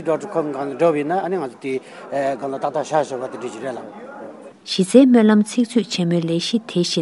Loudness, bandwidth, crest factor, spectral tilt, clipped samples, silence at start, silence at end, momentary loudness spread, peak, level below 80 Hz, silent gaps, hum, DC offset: -19 LUFS; 11.5 kHz; 18 dB; -5.5 dB/octave; under 0.1%; 0 s; 0 s; 18 LU; 0 dBFS; -70 dBFS; none; none; under 0.1%